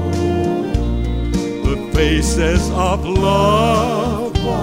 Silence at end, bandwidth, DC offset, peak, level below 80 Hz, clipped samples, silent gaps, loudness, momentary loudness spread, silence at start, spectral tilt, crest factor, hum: 0 s; 16 kHz; under 0.1%; -2 dBFS; -22 dBFS; under 0.1%; none; -17 LUFS; 7 LU; 0 s; -6 dB/octave; 14 dB; none